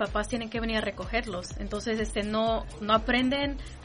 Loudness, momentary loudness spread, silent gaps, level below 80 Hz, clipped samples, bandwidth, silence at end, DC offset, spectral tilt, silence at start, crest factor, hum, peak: -29 LUFS; 9 LU; none; -40 dBFS; under 0.1%; 10.5 kHz; 0 s; under 0.1%; -4.5 dB/octave; 0 s; 18 dB; none; -10 dBFS